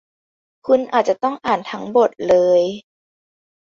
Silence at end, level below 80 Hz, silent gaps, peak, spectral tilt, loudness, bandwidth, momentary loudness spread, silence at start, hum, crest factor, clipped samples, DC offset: 1 s; -60 dBFS; none; -2 dBFS; -5.5 dB/octave; -18 LUFS; 7.4 kHz; 9 LU; 0.65 s; none; 16 dB; under 0.1%; under 0.1%